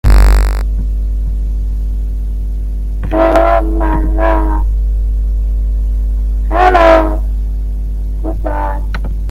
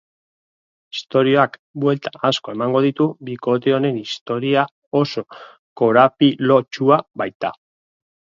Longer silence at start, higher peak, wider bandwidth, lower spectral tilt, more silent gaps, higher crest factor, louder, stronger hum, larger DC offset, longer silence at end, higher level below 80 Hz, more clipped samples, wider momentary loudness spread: second, 0.05 s vs 0.95 s; about the same, 0 dBFS vs 0 dBFS; first, 11 kHz vs 7.6 kHz; about the same, -7.5 dB/octave vs -6.5 dB/octave; second, none vs 1.59-1.74 s, 4.21-4.26 s, 4.71-4.91 s, 5.59-5.76 s, 7.35-7.40 s; second, 12 dB vs 18 dB; first, -14 LUFS vs -18 LUFS; neither; neither; second, 0 s vs 0.85 s; first, -12 dBFS vs -66 dBFS; first, 0.1% vs under 0.1%; about the same, 11 LU vs 12 LU